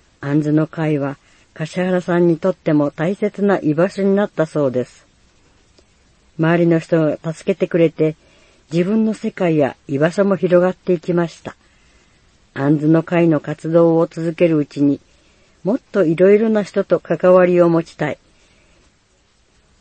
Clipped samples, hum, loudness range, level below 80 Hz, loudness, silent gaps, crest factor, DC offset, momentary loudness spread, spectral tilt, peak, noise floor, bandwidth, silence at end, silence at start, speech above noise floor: under 0.1%; none; 4 LU; -58 dBFS; -17 LUFS; none; 16 dB; under 0.1%; 10 LU; -8 dB/octave; 0 dBFS; -57 dBFS; 8.8 kHz; 1.65 s; 0.2 s; 42 dB